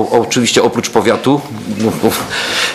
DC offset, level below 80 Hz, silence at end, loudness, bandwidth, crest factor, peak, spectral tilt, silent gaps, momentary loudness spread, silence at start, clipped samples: under 0.1%; -48 dBFS; 0 s; -13 LUFS; 15 kHz; 14 dB; 0 dBFS; -3.5 dB/octave; none; 6 LU; 0 s; 0.1%